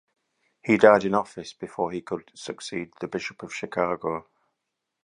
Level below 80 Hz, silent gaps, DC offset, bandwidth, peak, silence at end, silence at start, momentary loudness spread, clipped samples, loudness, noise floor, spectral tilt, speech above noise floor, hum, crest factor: -64 dBFS; none; under 0.1%; 11 kHz; -2 dBFS; 0.85 s; 0.65 s; 19 LU; under 0.1%; -25 LUFS; -82 dBFS; -5.5 dB/octave; 57 dB; none; 24 dB